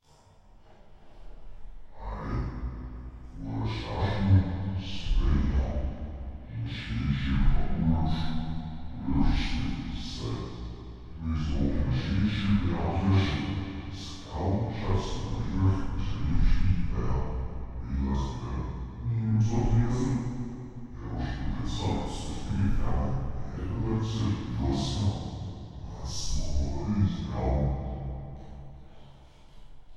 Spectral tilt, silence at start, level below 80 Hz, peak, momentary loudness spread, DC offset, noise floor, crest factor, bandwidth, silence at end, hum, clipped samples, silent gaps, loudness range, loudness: -7 dB/octave; 0.6 s; -34 dBFS; -10 dBFS; 13 LU; under 0.1%; -57 dBFS; 18 dB; 9 kHz; 0 s; none; under 0.1%; none; 4 LU; -31 LUFS